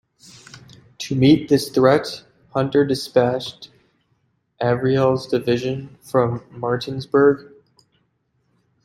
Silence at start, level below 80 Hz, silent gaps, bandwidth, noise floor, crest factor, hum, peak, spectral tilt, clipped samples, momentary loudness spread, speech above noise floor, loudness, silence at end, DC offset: 1 s; -56 dBFS; none; 16 kHz; -68 dBFS; 18 dB; none; -2 dBFS; -6.5 dB/octave; under 0.1%; 12 LU; 49 dB; -19 LUFS; 1.4 s; under 0.1%